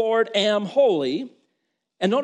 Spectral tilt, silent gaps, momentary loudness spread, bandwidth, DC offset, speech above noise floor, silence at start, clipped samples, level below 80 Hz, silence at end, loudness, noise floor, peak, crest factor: -5 dB/octave; none; 10 LU; 9.6 kHz; under 0.1%; 55 dB; 0 s; under 0.1%; -74 dBFS; 0 s; -21 LUFS; -76 dBFS; -8 dBFS; 14 dB